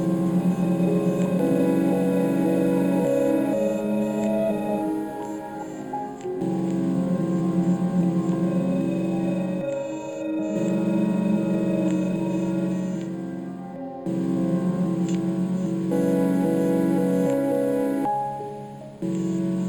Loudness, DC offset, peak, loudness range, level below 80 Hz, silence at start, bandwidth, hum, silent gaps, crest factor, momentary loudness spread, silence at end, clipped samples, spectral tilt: -24 LUFS; under 0.1%; -10 dBFS; 4 LU; -58 dBFS; 0 s; 19 kHz; none; none; 14 dB; 10 LU; 0 s; under 0.1%; -8.5 dB/octave